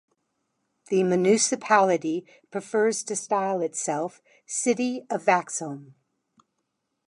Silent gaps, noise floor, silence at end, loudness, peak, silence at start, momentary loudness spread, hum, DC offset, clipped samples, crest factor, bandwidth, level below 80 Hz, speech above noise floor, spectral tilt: none; -78 dBFS; 1.2 s; -25 LUFS; -4 dBFS; 0.9 s; 13 LU; none; under 0.1%; under 0.1%; 22 dB; 11.5 kHz; -78 dBFS; 54 dB; -4 dB/octave